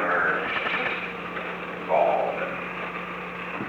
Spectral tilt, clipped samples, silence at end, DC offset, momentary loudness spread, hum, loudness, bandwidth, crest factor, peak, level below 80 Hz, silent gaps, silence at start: -6 dB/octave; under 0.1%; 0 s; under 0.1%; 10 LU; none; -27 LUFS; 19.5 kHz; 18 dB; -10 dBFS; -60 dBFS; none; 0 s